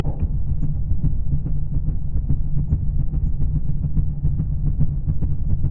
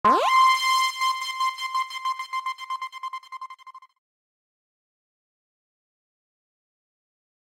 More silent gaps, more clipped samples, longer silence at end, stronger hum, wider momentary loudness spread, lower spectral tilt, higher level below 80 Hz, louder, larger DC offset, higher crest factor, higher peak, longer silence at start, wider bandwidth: neither; neither; second, 0 s vs 3.75 s; neither; second, 2 LU vs 19 LU; first, -14 dB/octave vs -0.5 dB/octave; first, -22 dBFS vs -70 dBFS; about the same, -25 LUFS vs -23 LUFS; neither; second, 14 dB vs 22 dB; about the same, -4 dBFS vs -6 dBFS; about the same, 0 s vs 0.05 s; second, 1.3 kHz vs 16 kHz